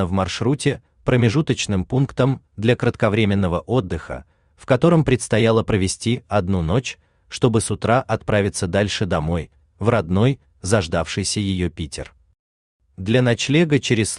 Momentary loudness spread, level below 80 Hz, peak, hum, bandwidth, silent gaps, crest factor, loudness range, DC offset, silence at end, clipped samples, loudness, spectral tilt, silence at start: 11 LU; -44 dBFS; -2 dBFS; none; 11 kHz; 12.39-12.80 s; 16 dB; 3 LU; under 0.1%; 0 s; under 0.1%; -20 LUFS; -5.5 dB/octave; 0 s